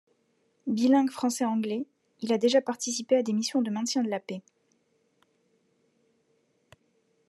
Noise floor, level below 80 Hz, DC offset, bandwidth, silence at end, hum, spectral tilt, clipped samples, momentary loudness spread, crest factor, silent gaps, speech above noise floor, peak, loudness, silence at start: -71 dBFS; -86 dBFS; under 0.1%; 12.5 kHz; 2.9 s; none; -4 dB/octave; under 0.1%; 15 LU; 18 dB; none; 45 dB; -12 dBFS; -27 LUFS; 0.65 s